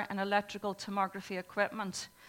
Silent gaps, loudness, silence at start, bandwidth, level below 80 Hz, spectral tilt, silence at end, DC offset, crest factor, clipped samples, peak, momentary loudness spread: none; -35 LUFS; 0 s; 17 kHz; -74 dBFS; -4 dB/octave; 0 s; under 0.1%; 20 dB; under 0.1%; -14 dBFS; 7 LU